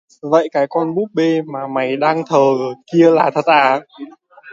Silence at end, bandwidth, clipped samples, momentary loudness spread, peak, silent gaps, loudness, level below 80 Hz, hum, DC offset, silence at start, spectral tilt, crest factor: 0 s; 7.6 kHz; under 0.1%; 9 LU; 0 dBFS; none; -15 LUFS; -66 dBFS; none; under 0.1%; 0.25 s; -6.5 dB/octave; 16 dB